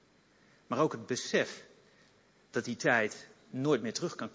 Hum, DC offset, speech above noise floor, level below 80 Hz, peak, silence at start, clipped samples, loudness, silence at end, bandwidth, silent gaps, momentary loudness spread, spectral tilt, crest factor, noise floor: none; under 0.1%; 33 dB; -78 dBFS; -14 dBFS; 0.7 s; under 0.1%; -33 LUFS; 0.05 s; 8 kHz; none; 11 LU; -4.5 dB/octave; 22 dB; -65 dBFS